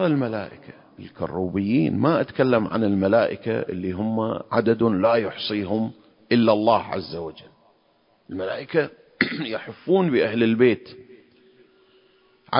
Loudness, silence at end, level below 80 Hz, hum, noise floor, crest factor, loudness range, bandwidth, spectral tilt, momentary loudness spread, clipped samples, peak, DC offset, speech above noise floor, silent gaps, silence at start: -22 LUFS; 0 s; -54 dBFS; none; -62 dBFS; 22 dB; 3 LU; 5.4 kHz; -11 dB/octave; 12 LU; under 0.1%; -2 dBFS; under 0.1%; 40 dB; none; 0 s